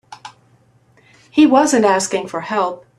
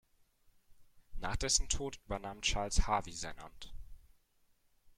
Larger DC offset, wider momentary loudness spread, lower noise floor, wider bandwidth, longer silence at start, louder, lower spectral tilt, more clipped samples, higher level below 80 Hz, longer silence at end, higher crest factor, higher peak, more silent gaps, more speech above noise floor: neither; second, 10 LU vs 20 LU; second, -54 dBFS vs -72 dBFS; second, 12.5 kHz vs 14 kHz; second, 0.1 s vs 0.7 s; first, -15 LUFS vs -36 LUFS; first, -3.5 dB/octave vs -2 dB/octave; neither; second, -62 dBFS vs -44 dBFS; second, 0.2 s vs 1 s; second, 16 dB vs 22 dB; first, -2 dBFS vs -16 dBFS; neither; about the same, 39 dB vs 37 dB